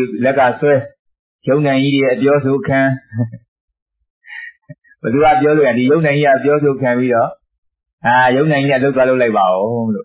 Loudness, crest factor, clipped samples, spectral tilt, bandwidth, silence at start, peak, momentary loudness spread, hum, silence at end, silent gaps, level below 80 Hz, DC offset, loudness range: -14 LUFS; 12 dB; under 0.1%; -10.5 dB/octave; 4 kHz; 0 s; -2 dBFS; 12 LU; none; 0 s; 0.99-1.05 s, 1.19-1.39 s, 3.48-3.68 s, 3.82-3.86 s, 4.10-4.21 s, 7.58-7.63 s, 7.93-7.98 s; -52 dBFS; under 0.1%; 4 LU